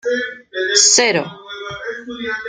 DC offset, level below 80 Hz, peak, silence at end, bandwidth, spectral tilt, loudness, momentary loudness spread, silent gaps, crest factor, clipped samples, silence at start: under 0.1%; -58 dBFS; 0 dBFS; 0 s; 11 kHz; -0.5 dB/octave; -14 LUFS; 19 LU; none; 18 dB; under 0.1%; 0.05 s